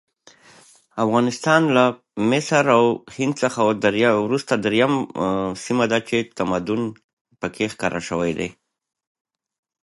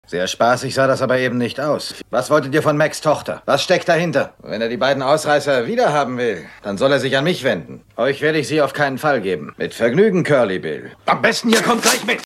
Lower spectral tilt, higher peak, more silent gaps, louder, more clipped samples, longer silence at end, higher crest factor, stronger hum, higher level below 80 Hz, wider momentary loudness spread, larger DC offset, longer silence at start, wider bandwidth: about the same, -5 dB/octave vs -4.5 dB/octave; about the same, -2 dBFS vs 0 dBFS; first, 7.04-7.25 s vs none; second, -20 LUFS vs -17 LUFS; neither; first, 1.35 s vs 0 s; about the same, 20 dB vs 18 dB; neither; about the same, -56 dBFS vs -58 dBFS; about the same, 9 LU vs 8 LU; neither; first, 0.95 s vs 0.1 s; second, 11.5 kHz vs 16 kHz